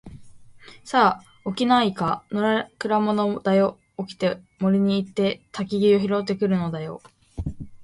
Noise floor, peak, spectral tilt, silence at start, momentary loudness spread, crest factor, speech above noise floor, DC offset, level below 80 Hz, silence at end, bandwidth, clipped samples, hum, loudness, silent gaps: -46 dBFS; -4 dBFS; -7 dB/octave; 0.05 s; 15 LU; 18 dB; 24 dB; under 0.1%; -48 dBFS; 0 s; 11.5 kHz; under 0.1%; none; -23 LUFS; none